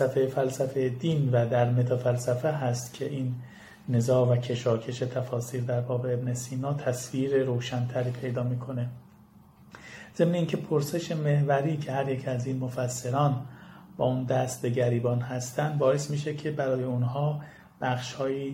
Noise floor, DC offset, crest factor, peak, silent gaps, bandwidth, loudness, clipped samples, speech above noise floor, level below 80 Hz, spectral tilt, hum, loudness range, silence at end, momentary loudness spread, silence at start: -55 dBFS; under 0.1%; 18 dB; -10 dBFS; none; 16 kHz; -28 LUFS; under 0.1%; 27 dB; -64 dBFS; -6.5 dB/octave; none; 3 LU; 0 s; 9 LU; 0 s